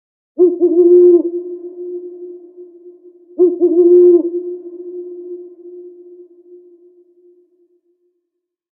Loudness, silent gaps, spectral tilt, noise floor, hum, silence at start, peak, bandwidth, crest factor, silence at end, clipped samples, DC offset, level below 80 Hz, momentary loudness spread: -11 LUFS; none; -12.5 dB/octave; -76 dBFS; none; 0.4 s; -2 dBFS; 1.2 kHz; 14 dB; 2.9 s; under 0.1%; under 0.1%; -78 dBFS; 26 LU